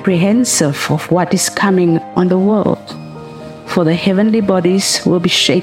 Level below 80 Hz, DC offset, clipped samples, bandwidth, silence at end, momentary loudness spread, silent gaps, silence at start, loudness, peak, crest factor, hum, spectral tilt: -52 dBFS; under 0.1%; under 0.1%; 16.5 kHz; 0 s; 16 LU; none; 0 s; -13 LUFS; 0 dBFS; 14 dB; none; -4.5 dB/octave